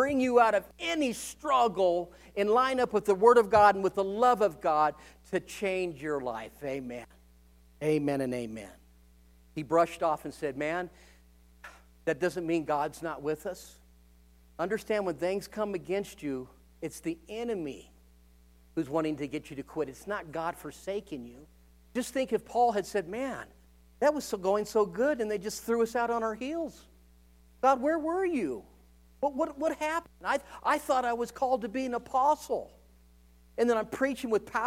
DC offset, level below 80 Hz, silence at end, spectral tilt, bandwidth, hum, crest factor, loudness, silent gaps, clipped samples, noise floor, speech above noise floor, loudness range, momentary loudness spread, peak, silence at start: under 0.1%; -60 dBFS; 0 s; -5 dB/octave; 16 kHz; none; 22 dB; -30 LUFS; none; under 0.1%; -59 dBFS; 29 dB; 11 LU; 13 LU; -8 dBFS; 0 s